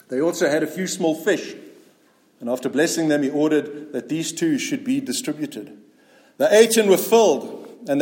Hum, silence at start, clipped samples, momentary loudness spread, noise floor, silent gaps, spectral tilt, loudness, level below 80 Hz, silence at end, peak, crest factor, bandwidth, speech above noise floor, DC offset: none; 0.1 s; under 0.1%; 16 LU; -58 dBFS; none; -4 dB/octave; -20 LUFS; -74 dBFS; 0 s; -2 dBFS; 18 dB; 17 kHz; 38 dB; under 0.1%